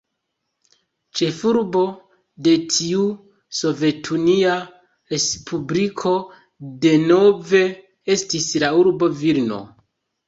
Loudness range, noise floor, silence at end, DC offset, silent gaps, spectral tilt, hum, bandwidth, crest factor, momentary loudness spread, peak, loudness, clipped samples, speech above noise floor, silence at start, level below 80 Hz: 4 LU; -76 dBFS; 0.6 s; under 0.1%; none; -4.5 dB/octave; none; 8 kHz; 18 dB; 13 LU; -2 dBFS; -19 LUFS; under 0.1%; 58 dB; 1.15 s; -60 dBFS